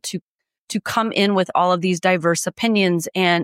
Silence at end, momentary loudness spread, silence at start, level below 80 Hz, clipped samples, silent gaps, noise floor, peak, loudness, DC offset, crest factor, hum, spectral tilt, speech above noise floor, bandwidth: 0 s; 9 LU; 0.05 s; -66 dBFS; under 0.1%; 0.22-0.39 s, 0.58-0.67 s; -65 dBFS; -4 dBFS; -19 LUFS; under 0.1%; 14 dB; none; -4.5 dB/octave; 47 dB; 16 kHz